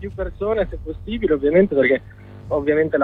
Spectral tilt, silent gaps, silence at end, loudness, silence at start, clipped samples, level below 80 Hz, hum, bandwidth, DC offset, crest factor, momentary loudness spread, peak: -9 dB/octave; none; 0 s; -20 LUFS; 0 s; under 0.1%; -36 dBFS; none; 4.5 kHz; under 0.1%; 14 dB; 13 LU; -4 dBFS